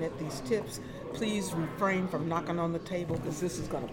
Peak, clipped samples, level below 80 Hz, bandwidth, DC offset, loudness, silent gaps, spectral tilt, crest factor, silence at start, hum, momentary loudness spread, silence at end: -16 dBFS; under 0.1%; -56 dBFS; 17.5 kHz; under 0.1%; -33 LUFS; none; -5.5 dB/octave; 16 dB; 0 s; none; 7 LU; 0 s